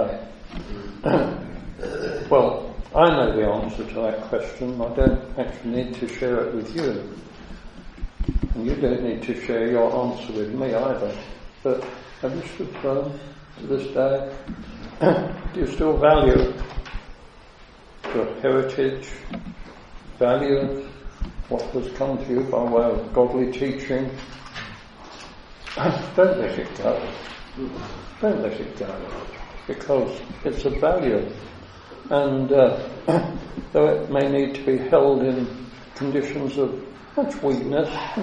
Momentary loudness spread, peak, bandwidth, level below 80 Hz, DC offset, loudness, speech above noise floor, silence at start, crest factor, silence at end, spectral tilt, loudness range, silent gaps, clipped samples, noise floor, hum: 19 LU; -2 dBFS; 9.4 kHz; -36 dBFS; under 0.1%; -23 LUFS; 24 dB; 0 s; 22 dB; 0 s; -7.5 dB/octave; 6 LU; none; under 0.1%; -46 dBFS; none